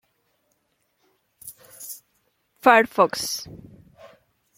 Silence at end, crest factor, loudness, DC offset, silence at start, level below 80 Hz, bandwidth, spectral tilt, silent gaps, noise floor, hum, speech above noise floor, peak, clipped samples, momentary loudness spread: 1 s; 24 dB; -20 LUFS; under 0.1%; 1.45 s; -64 dBFS; 16.5 kHz; -3 dB/octave; none; -71 dBFS; none; 51 dB; -2 dBFS; under 0.1%; 25 LU